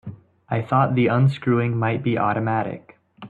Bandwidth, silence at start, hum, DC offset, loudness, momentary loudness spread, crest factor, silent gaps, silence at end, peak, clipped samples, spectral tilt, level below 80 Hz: 4.6 kHz; 0.05 s; none; under 0.1%; -21 LUFS; 11 LU; 16 dB; none; 0 s; -6 dBFS; under 0.1%; -9.5 dB/octave; -58 dBFS